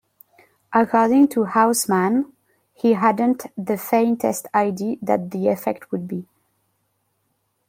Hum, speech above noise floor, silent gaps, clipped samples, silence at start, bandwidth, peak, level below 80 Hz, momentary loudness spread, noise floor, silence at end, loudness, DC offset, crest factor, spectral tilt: none; 51 dB; none; under 0.1%; 0.7 s; 16.5 kHz; -2 dBFS; -66 dBFS; 11 LU; -70 dBFS; 1.45 s; -20 LUFS; under 0.1%; 18 dB; -5.5 dB/octave